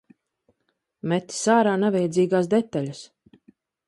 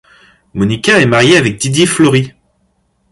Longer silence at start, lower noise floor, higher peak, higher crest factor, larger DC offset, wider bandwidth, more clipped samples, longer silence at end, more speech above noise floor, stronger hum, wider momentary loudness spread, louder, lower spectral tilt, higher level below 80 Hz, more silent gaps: first, 1.05 s vs 0.55 s; first, -75 dBFS vs -59 dBFS; second, -6 dBFS vs 0 dBFS; first, 18 dB vs 12 dB; neither; about the same, 11.5 kHz vs 11.5 kHz; neither; about the same, 0.85 s vs 0.8 s; first, 53 dB vs 49 dB; neither; first, 14 LU vs 9 LU; second, -22 LUFS vs -10 LUFS; about the same, -5.5 dB/octave vs -4.5 dB/octave; second, -70 dBFS vs -44 dBFS; neither